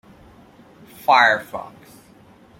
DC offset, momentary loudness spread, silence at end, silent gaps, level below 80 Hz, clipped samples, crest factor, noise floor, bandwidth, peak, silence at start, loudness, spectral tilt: under 0.1%; 20 LU; 0.9 s; none; -62 dBFS; under 0.1%; 22 dB; -49 dBFS; 16.5 kHz; -2 dBFS; 1.1 s; -17 LUFS; -3 dB/octave